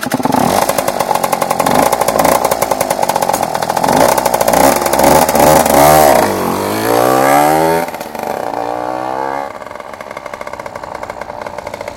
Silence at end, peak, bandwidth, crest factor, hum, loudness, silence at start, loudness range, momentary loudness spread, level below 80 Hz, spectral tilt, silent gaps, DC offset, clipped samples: 0 s; 0 dBFS; 19 kHz; 12 dB; none; -12 LUFS; 0 s; 12 LU; 17 LU; -40 dBFS; -3.5 dB/octave; none; under 0.1%; 0.3%